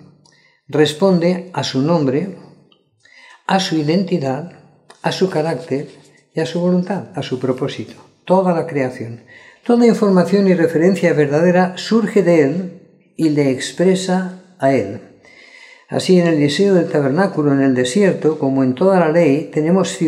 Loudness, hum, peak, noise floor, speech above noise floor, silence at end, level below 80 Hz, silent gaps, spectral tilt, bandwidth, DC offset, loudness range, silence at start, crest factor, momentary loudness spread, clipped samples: -16 LUFS; none; -2 dBFS; -53 dBFS; 38 dB; 0 s; -68 dBFS; none; -6.5 dB/octave; 12 kHz; under 0.1%; 6 LU; 0.7 s; 16 dB; 11 LU; under 0.1%